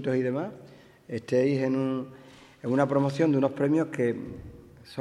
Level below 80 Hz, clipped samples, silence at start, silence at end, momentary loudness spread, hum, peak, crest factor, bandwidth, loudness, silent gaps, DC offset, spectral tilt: -60 dBFS; under 0.1%; 0 s; 0 s; 17 LU; none; -10 dBFS; 18 dB; 11 kHz; -27 LUFS; none; under 0.1%; -8 dB/octave